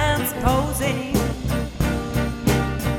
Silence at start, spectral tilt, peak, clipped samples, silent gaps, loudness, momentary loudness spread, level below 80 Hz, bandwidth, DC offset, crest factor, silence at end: 0 s; -5.5 dB/octave; -4 dBFS; under 0.1%; none; -22 LUFS; 4 LU; -30 dBFS; 18.5 kHz; under 0.1%; 16 dB; 0 s